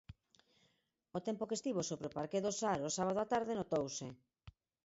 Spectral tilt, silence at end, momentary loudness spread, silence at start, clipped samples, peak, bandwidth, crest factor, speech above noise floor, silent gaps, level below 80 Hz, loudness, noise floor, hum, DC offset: -5 dB/octave; 0.35 s; 9 LU; 0.1 s; under 0.1%; -22 dBFS; 7.6 kHz; 18 dB; 41 dB; none; -70 dBFS; -39 LUFS; -80 dBFS; none; under 0.1%